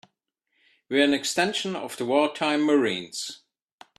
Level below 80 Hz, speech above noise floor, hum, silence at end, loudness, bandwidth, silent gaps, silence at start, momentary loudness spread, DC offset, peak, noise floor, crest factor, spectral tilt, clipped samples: -70 dBFS; 52 dB; none; 0.65 s; -24 LUFS; 13.5 kHz; none; 0.9 s; 10 LU; under 0.1%; -8 dBFS; -77 dBFS; 20 dB; -3.5 dB/octave; under 0.1%